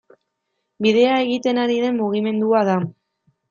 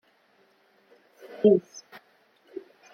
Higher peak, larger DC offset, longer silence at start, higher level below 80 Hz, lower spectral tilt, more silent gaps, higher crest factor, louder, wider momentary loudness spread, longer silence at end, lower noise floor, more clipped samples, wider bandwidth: first, -4 dBFS vs -8 dBFS; neither; second, 0.8 s vs 1.45 s; first, -68 dBFS vs -78 dBFS; about the same, -6.5 dB/octave vs -7 dB/octave; neither; second, 16 dB vs 22 dB; first, -19 LUFS vs -23 LUFS; second, 5 LU vs 25 LU; second, 0.6 s vs 1.35 s; first, -75 dBFS vs -64 dBFS; neither; about the same, 7.2 kHz vs 6.8 kHz